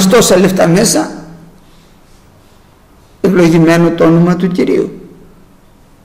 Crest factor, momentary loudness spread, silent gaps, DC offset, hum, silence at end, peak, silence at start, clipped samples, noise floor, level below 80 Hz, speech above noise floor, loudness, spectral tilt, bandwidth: 12 dB; 9 LU; none; under 0.1%; none; 0.95 s; 0 dBFS; 0 s; under 0.1%; -43 dBFS; -40 dBFS; 35 dB; -9 LUFS; -5.5 dB/octave; 16 kHz